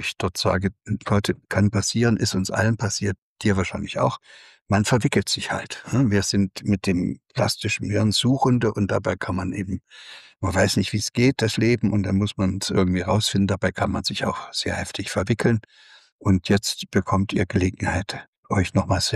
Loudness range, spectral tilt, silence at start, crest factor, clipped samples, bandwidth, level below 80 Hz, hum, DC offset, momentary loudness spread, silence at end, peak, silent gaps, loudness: 2 LU; -5 dB/octave; 0 s; 16 dB; under 0.1%; 13.5 kHz; -46 dBFS; none; under 0.1%; 7 LU; 0 s; -8 dBFS; 3.18-3.36 s, 4.61-4.65 s, 16.12-16.19 s, 18.28-18.43 s; -23 LUFS